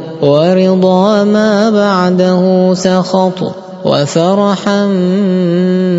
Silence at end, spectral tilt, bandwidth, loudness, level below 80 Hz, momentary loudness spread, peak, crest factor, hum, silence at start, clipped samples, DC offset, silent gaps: 0 s; -6.5 dB/octave; 8 kHz; -10 LUFS; -56 dBFS; 4 LU; 0 dBFS; 10 dB; none; 0 s; 0.4%; under 0.1%; none